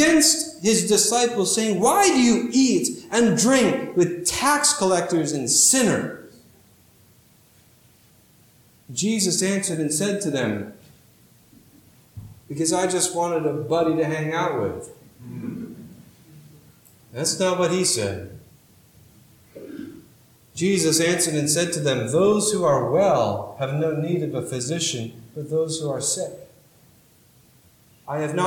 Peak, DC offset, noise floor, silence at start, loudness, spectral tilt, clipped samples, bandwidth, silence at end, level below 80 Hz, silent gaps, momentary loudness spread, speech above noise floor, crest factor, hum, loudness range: -6 dBFS; under 0.1%; -55 dBFS; 0 s; -21 LUFS; -3.5 dB/octave; under 0.1%; 19 kHz; 0 s; -60 dBFS; none; 18 LU; 34 dB; 18 dB; none; 9 LU